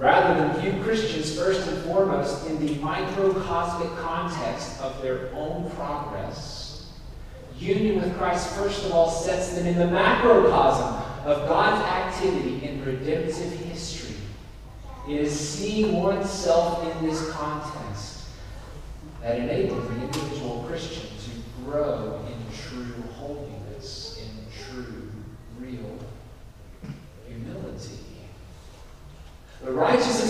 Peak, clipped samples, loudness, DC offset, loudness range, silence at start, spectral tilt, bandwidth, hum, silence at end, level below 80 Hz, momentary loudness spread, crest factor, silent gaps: -4 dBFS; under 0.1%; -25 LUFS; 0.1%; 18 LU; 0 s; -5 dB/octave; 15 kHz; none; 0 s; -42 dBFS; 20 LU; 22 dB; none